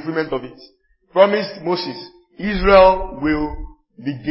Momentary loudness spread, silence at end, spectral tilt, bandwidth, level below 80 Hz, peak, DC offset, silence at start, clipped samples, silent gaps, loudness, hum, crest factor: 18 LU; 0 s; -9.5 dB/octave; 5.8 kHz; -34 dBFS; 0 dBFS; under 0.1%; 0 s; under 0.1%; none; -17 LUFS; none; 18 dB